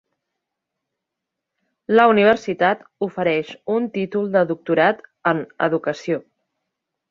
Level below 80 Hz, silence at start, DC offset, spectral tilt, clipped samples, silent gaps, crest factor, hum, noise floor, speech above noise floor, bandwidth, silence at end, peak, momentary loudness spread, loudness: -64 dBFS; 1.9 s; under 0.1%; -6.5 dB/octave; under 0.1%; none; 20 dB; none; -82 dBFS; 63 dB; 7.4 kHz; 0.9 s; 0 dBFS; 11 LU; -20 LUFS